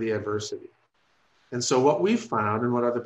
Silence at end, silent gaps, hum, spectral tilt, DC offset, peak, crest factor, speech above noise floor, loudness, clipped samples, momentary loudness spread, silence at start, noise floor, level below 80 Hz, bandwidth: 0 s; none; none; -5 dB/octave; under 0.1%; -8 dBFS; 18 dB; 42 dB; -25 LUFS; under 0.1%; 14 LU; 0 s; -67 dBFS; -68 dBFS; 11 kHz